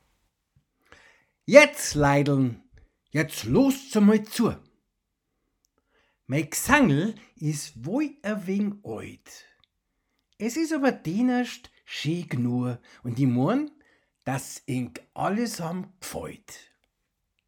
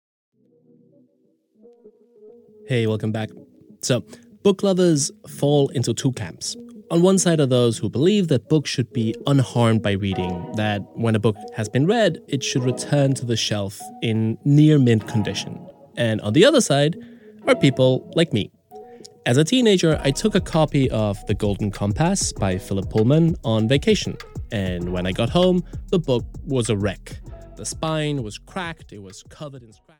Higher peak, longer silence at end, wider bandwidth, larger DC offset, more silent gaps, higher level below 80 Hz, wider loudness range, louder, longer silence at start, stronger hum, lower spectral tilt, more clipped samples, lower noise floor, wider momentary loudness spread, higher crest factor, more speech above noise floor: about the same, 0 dBFS vs -2 dBFS; first, 0.9 s vs 0.4 s; first, 19 kHz vs 17 kHz; neither; neither; second, -54 dBFS vs -42 dBFS; first, 10 LU vs 6 LU; second, -25 LUFS vs -20 LUFS; second, 1.5 s vs 1.85 s; neither; about the same, -5.5 dB/octave vs -5.5 dB/octave; neither; first, -79 dBFS vs -64 dBFS; first, 17 LU vs 14 LU; first, 26 dB vs 18 dB; first, 54 dB vs 44 dB